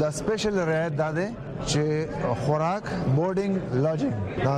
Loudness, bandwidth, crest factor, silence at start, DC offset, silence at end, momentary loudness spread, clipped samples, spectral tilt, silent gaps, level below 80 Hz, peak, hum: -26 LUFS; 12 kHz; 14 dB; 0 s; under 0.1%; 0 s; 4 LU; under 0.1%; -6 dB/octave; none; -48 dBFS; -10 dBFS; none